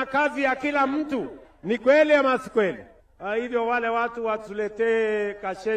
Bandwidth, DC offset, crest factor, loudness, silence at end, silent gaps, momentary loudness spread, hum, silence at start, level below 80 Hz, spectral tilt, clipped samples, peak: 10 kHz; under 0.1%; 16 dB; -24 LUFS; 0 s; none; 12 LU; none; 0 s; -58 dBFS; -5.5 dB/octave; under 0.1%; -8 dBFS